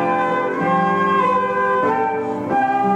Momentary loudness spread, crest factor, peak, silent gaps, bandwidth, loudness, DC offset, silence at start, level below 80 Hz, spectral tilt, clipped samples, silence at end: 4 LU; 12 dB; -6 dBFS; none; 9.4 kHz; -18 LUFS; under 0.1%; 0 s; -60 dBFS; -7 dB/octave; under 0.1%; 0 s